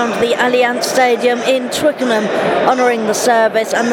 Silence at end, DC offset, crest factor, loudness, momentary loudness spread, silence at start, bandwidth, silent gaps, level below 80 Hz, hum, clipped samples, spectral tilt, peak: 0 s; under 0.1%; 14 dB; -14 LUFS; 3 LU; 0 s; 17.5 kHz; none; -56 dBFS; none; under 0.1%; -3 dB/octave; 0 dBFS